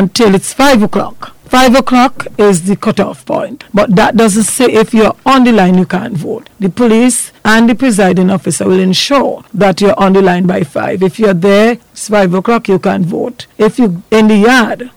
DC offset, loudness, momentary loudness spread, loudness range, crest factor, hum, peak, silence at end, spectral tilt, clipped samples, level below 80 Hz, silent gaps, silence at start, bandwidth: 1%; -9 LUFS; 9 LU; 1 LU; 8 dB; none; -2 dBFS; 0.1 s; -5 dB/octave; under 0.1%; -38 dBFS; none; 0 s; 18.5 kHz